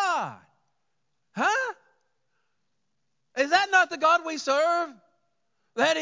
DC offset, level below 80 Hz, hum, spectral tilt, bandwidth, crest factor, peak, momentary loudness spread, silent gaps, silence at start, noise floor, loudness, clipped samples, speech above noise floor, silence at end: under 0.1%; -88 dBFS; none; -2 dB/octave; 7.6 kHz; 20 dB; -8 dBFS; 16 LU; none; 0 s; -80 dBFS; -24 LUFS; under 0.1%; 56 dB; 0 s